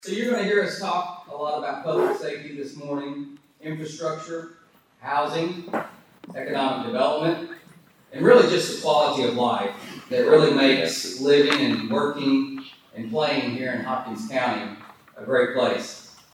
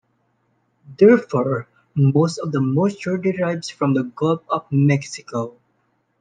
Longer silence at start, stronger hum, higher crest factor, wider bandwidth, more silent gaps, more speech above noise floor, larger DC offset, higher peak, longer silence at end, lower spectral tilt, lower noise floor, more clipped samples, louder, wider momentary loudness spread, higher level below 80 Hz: second, 0.05 s vs 0.9 s; neither; about the same, 20 dB vs 18 dB; first, 16 kHz vs 9.4 kHz; neither; second, 30 dB vs 48 dB; neither; about the same, -2 dBFS vs -2 dBFS; second, 0.25 s vs 0.7 s; second, -4.5 dB/octave vs -7.5 dB/octave; second, -53 dBFS vs -67 dBFS; neither; second, -23 LUFS vs -20 LUFS; first, 19 LU vs 13 LU; second, -74 dBFS vs -62 dBFS